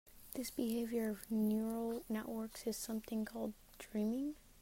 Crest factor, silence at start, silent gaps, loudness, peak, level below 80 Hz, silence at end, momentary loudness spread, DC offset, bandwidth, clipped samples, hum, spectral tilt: 16 dB; 0.05 s; none; -41 LUFS; -26 dBFS; -66 dBFS; 0 s; 9 LU; under 0.1%; 16 kHz; under 0.1%; none; -5.5 dB/octave